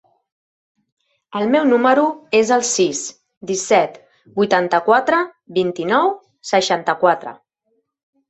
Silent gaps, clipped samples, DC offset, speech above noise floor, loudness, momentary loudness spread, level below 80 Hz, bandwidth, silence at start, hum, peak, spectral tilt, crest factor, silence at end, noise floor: 3.37-3.41 s; under 0.1%; under 0.1%; 52 dB; -17 LUFS; 11 LU; -66 dBFS; 8.4 kHz; 1.3 s; none; -2 dBFS; -3.5 dB/octave; 18 dB; 0.95 s; -68 dBFS